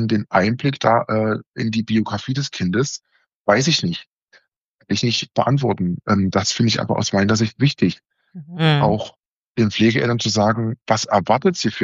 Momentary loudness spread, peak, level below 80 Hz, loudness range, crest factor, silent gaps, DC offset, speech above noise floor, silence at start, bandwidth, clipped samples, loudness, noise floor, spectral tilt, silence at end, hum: 8 LU; -2 dBFS; -54 dBFS; 3 LU; 18 dB; 1.46-1.52 s, 3.35-3.45 s, 4.07-4.28 s, 4.56-4.78 s, 9.28-9.55 s; under 0.1%; 45 dB; 0 s; 8 kHz; under 0.1%; -19 LUFS; -64 dBFS; -4.5 dB/octave; 0 s; none